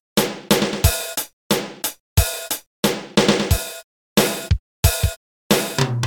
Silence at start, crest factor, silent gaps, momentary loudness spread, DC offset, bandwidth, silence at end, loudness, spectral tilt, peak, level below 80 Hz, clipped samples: 0.15 s; 20 dB; 1.33-1.50 s, 2.00-2.16 s, 2.66-2.83 s, 3.84-4.16 s, 4.59-4.83 s, 5.16-5.50 s; 9 LU; under 0.1%; 17.5 kHz; 0 s; -20 LUFS; -4 dB/octave; 0 dBFS; -30 dBFS; under 0.1%